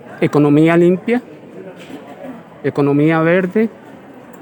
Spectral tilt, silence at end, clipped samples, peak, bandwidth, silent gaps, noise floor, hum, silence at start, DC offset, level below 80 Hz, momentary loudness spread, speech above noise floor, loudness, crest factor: -8.5 dB/octave; 0.1 s; under 0.1%; 0 dBFS; 20 kHz; none; -37 dBFS; none; 0.05 s; under 0.1%; -66 dBFS; 23 LU; 24 dB; -14 LUFS; 16 dB